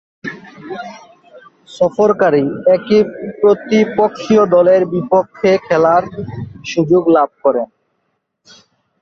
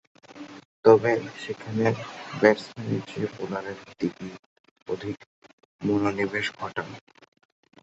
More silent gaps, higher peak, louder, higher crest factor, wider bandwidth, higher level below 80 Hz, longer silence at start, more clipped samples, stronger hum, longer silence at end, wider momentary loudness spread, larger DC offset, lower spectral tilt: second, none vs 0.65-0.83 s, 4.39-4.64 s, 4.71-4.76 s, 4.82-4.86 s, 5.26-5.42 s, 5.53-5.58 s, 5.65-5.79 s; about the same, 0 dBFS vs -2 dBFS; first, -13 LUFS vs -26 LUFS; second, 14 dB vs 24 dB; about the same, 7.6 kHz vs 8 kHz; first, -52 dBFS vs -64 dBFS; about the same, 0.25 s vs 0.3 s; neither; neither; first, 1.35 s vs 0.85 s; second, 17 LU vs 21 LU; neither; about the same, -7 dB/octave vs -6.5 dB/octave